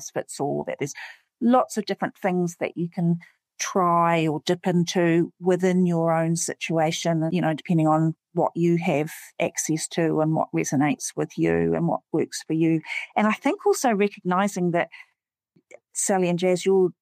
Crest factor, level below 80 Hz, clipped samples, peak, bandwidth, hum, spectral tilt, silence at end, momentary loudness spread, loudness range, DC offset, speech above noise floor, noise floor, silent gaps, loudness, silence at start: 16 dB; -66 dBFS; under 0.1%; -6 dBFS; 15 kHz; none; -5.5 dB/octave; 0.1 s; 8 LU; 2 LU; under 0.1%; 44 dB; -67 dBFS; none; -24 LUFS; 0 s